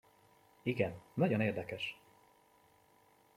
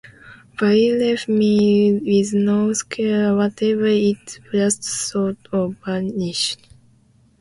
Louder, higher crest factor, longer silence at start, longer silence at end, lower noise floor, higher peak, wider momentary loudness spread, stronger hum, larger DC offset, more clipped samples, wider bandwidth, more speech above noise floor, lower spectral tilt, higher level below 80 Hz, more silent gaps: second, -37 LUFS vs -19 LUFS; first, 22 dB vs 14 dB; first, 0.65 s vs 0.05 s; first, 1.45 s vs 0.85 s; first, -68 dBFS vs -55 dBFS; second, -18 dBFS vs -6 dBFS; about the same, 10 LU vs 8 LU; neither; neither; neither; first, 16 kHz vs 11.5 kHz; second, 33 dB vs 37 dB; first, -7.5 dB/octave vs -5 dB/octave; second, -74 dBFS vs -58 dBFS; neither